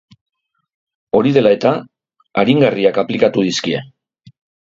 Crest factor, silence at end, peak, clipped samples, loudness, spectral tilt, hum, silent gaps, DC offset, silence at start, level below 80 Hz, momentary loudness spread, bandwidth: 16 dB; 0.8 s; 0 dBFS; under 0.1%; -15 LUFS; -6 dB/octave; none; none; under 0.1%; 1.15 s; -56 dBFS; 10 LU; 7.8 kHz